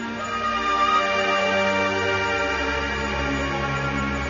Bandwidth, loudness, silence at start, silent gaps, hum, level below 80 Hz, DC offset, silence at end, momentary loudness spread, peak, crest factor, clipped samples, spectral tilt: 7.4 kHz; -22 LUFS; 0 s; none; none; -38 dBFS; under 0.1%; 0 s; 5 LU; -8 dBFS; 14 dB; under 0.1%; -4.5 dB/octave